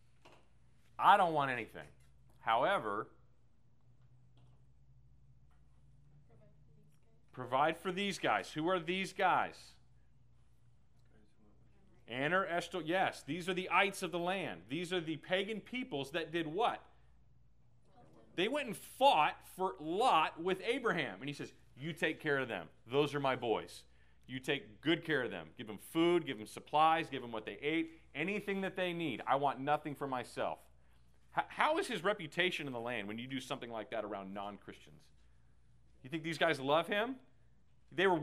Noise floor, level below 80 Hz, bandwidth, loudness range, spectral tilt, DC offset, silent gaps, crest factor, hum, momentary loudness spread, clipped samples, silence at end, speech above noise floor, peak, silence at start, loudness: -71 dBFS; -72 dBFS; 15.5 kHz; 6 LU; -5 dB/octave; under 0.1%; none; 24 dB; none; 14 LU; under 0.1%; 0 s; 35 dB; -12 dBFS; 0.25 s; -36 LUFS